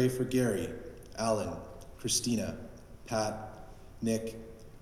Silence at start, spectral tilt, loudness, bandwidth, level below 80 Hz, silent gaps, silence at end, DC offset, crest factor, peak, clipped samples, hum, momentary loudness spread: 0 s; -4.5 dB/octave; -33 LUFS; 16 kHz; -54 dBFS; none; 0 s; under 0.1%; 18 dB; -16 dBFS; under 0.1%; none; 20 LU